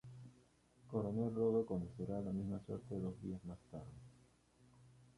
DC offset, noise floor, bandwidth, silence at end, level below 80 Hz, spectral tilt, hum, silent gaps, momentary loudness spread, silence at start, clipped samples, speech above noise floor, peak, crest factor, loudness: under 0.1%; -71 dBFS; 11.5 kHz; 0.15 s; -66 dBFS; -10 dB/octave; none; none; 21 LU; 0.05 s; under 0.1%; 29 dB; -26 dBFS; 18 dB; -43 LUFS